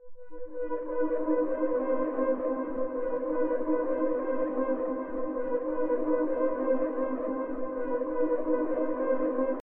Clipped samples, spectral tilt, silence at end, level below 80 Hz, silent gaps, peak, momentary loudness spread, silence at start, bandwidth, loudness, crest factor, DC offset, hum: under 0.1%; -10 dB/octave; 0.05 s; -56 dBFS; none; -14 dBFS; 5 LU; 0 s; 3.1 kHz; -30 LUFS; 14 dB; under 0.1%; none